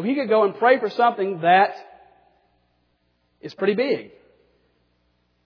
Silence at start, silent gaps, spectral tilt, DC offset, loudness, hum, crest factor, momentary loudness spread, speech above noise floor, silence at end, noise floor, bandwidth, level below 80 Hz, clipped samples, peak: 0 s; none; -7 dB/octave; under 0.1%; -20 LUFS; none; 20 dB; 15 LU; 48 dB; 1.4 s; -68 dBFS; 5.4 kHz; -74 dBFS; under 0.1%; -4 dBFS